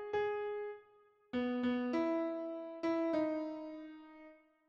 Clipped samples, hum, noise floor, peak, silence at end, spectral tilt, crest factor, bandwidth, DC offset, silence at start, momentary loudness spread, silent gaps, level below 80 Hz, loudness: under 0.1%; none; -67 dBFS; -24 dBFS; 0.35 s; -6.5 dB/octave; 14 dB; 7 kHz; under 0.1%; 0 s; 18 LU; none; -76 dBFS; -38 LUFS